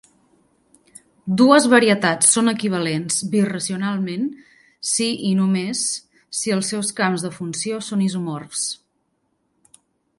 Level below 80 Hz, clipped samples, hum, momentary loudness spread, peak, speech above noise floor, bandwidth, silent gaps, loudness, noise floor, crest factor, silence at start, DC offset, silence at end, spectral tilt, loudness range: -66 dBFS; under 0.1%; none; 13 LU; 0 dBFS; 50 dB; 11.5 kHz; none; -19 LUFS; -69 dBFS; 20 dB; 1.25 s; under 0.1%; 1.45 s; -3.5 dB/octave; 7 LU